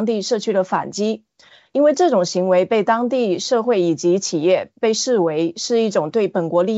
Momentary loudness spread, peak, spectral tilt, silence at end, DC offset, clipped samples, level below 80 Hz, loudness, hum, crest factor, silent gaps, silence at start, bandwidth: 5 LU; -4 dBFS; -4.5 dB/octave; 0 s; under 0.1%; under 0.1%; -72 dBFS; -18 LUFS; none; 14 dB; none; 0 s; 8 kHz